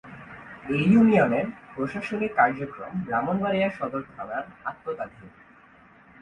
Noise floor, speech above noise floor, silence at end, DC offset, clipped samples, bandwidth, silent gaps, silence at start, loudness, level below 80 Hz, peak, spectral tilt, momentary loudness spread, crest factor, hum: -54 dBFS; 29 dB; 0.95 s; under 0.1%; under 0.1%; 9.4 kHz; none; 0.05 s; -25 LUFS; -58 dBFS; -6 dBFS; -8 dB/octave; 17 LU; 20 dB; none